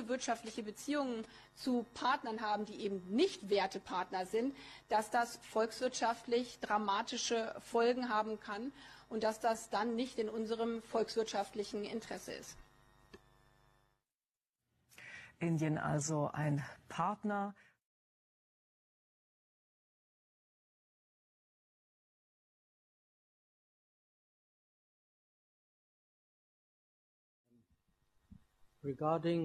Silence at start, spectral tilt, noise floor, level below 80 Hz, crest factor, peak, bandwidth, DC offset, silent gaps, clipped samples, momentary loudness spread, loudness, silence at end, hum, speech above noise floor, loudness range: 0 s; -5 dB/octave; under -90 dBFS; -74 dBFS; 18 dB; -22 dBFS; 13 kHz; under 0.1%; 14.49-14.53 s, 17.84-27.44 s; under 0.1%; 11 LU; -38 LUFS; 0 s; none; over 53 dB; 11 LU